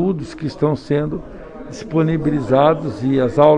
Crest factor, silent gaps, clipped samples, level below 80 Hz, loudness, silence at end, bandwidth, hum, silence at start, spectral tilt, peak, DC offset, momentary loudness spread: 18 dB; none; under 0.1%; -42 dBFS; -18 LUFS; 0 s; 9.6 kHz; none; 0 s; -8 dB/octave; 0 dBFS; under 0.1%; 18 LU